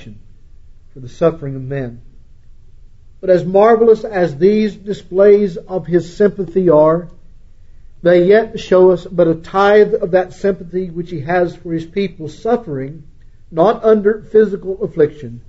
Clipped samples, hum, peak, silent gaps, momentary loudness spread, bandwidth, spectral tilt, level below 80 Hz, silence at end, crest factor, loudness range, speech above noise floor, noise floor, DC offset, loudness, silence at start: under 0.1%; none; 0 dBFS; none; 14 LU; 7.8 kHz; -8 dB/octave; -40 dBFS; 0.1 s; 14 dB; 6 LU; 25 dB; -38 dBFS; under 0.1%; -14 LUFS; 0 s